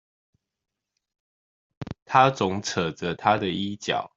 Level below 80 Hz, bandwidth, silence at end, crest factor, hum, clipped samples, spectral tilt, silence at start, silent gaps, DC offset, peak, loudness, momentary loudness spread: -60 dBFS; 7.8 kHz; 0.1 s; 24 dB; none; under 0.1%; -4.5 dB/octave; 1.8 s; 2.02-2.06 s; under 0.1%; -2 dBFS; -24 LUFS; 18 LU